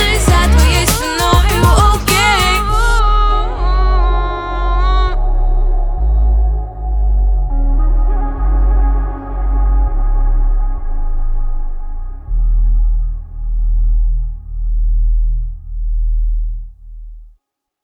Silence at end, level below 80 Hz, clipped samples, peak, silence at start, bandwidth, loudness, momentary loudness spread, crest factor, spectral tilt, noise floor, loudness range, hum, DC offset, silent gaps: 0.6 s; -14 dBFS; under 0.1%; 0 dBFS; 0 s; 18.5 kHz; -16 LUFS; 13 LU; 12 dB; -4.5 dB/octave; -59 dBFS; 8 LU; none; under 0.1%; none